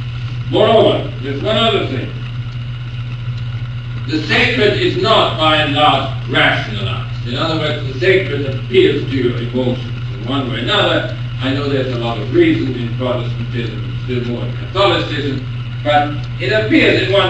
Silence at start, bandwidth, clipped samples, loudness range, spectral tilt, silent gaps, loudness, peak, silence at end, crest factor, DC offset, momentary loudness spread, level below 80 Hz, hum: 0 s; 8.4 kHz; under 0.1%; 5 LU; -6.5 dB/octave; none; -16 LUFS; 0 dBFS; 0 s; 16 dB; 0.1%; 12 LU; -34 dBFS; none